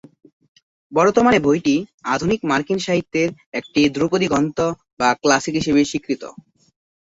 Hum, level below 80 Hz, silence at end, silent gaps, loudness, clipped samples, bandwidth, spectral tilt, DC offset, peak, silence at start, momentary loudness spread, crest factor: none; -52 dBFS; 0.8 s; 1.94-1.98 s, 3.46-3.52 s, 4.93-4.97 s; -19 LUFS; under 0.1%; 8 kHz; -5 dB/octave; under 0.1%; -2 dBFS; 0.9 s; 9 LU; 18 dB